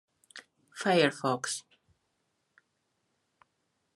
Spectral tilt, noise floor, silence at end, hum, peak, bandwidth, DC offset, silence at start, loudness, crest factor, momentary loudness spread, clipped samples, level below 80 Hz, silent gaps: -4 dB/octave; -79 dBFS; 2.35 s; none; -10 dBFS; 13 kHz; under 0.1%; 0.35 s; -29 LUFS; 26 dB; 25 LU; under 0.1%; -82 dBFS; none